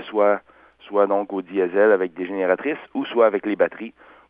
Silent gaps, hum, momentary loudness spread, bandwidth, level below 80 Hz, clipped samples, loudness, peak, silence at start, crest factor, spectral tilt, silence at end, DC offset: none; none; 9 LU; 3.9 kHz; -70 dBFS; under 0.1%; -21 LUFS; -4 dBFS; 0 s; 18 dB; -9 dB/octave; 0.4 s; under 0.1%